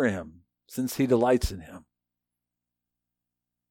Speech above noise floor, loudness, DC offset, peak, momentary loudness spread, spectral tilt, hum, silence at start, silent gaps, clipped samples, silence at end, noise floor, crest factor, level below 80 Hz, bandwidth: 61 dB; -26 LUFS; under 0.1%; -10 dBFS; 22 LU; -6 dB/octave; 60 Hz at -55 dBFS; 0 s; none; under 0.1%; 1.9 s; -87 dBFS; 20 dB; -44 dBFS; 18.5 kHz